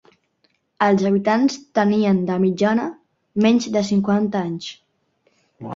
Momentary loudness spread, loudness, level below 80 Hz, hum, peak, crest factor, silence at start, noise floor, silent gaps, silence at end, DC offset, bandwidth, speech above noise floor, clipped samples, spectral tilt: 12 LU; -19 LUFS; -62 dBFS; none; -2 dBFS; 18 dB; 0.8 s; -66 dBFS; none; 0 s; under 0.1%; 7.6 kHz; 48 dB; under 0.1%; -6.5 dB/octave